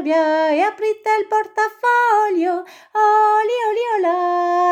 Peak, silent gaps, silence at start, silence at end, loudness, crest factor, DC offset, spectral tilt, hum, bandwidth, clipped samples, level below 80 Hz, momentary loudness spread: -4 dBFS; none; 0 s; 0 s; -17 LUFS; 12 dB; under 0.1%; -2.5 dB/octave; none; 15 kHz; under 0.1%; -74 dBFS; 6 LU